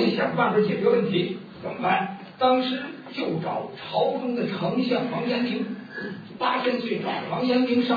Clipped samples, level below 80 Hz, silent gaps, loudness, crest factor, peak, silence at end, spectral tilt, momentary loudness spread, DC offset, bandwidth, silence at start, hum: under 0.1%; -70 dBFS; none; -25 LUFS; 18 dB; -6 dBFS; 0 s; -8 dB/octave; 11 LU; under 0.1%; 5 kHz; 0 s; none